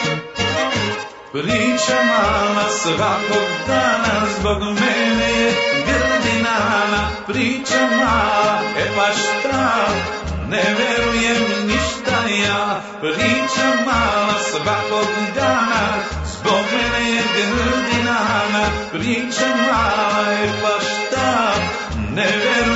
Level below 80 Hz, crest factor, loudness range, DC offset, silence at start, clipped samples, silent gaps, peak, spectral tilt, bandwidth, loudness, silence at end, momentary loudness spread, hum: -38 dBFS; 14 dB; 1 LU; under 0.1%; 0 s; under 0.1%; none; -4 dBFS; -3.5 dB/octave; 8 kHz; -17 LUFS; 0 s; 5 LU; none